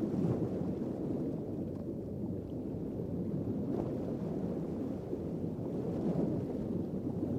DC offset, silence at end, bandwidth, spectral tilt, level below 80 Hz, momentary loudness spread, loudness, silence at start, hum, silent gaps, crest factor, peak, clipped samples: under 0.1%; 0 s; 14.5 kHz; -10.5 dB/octave; -56 dBFS; 6 LU; -37 LUFS; 0 s; none; none; 16 dB; -22 dBFS; under 0.1%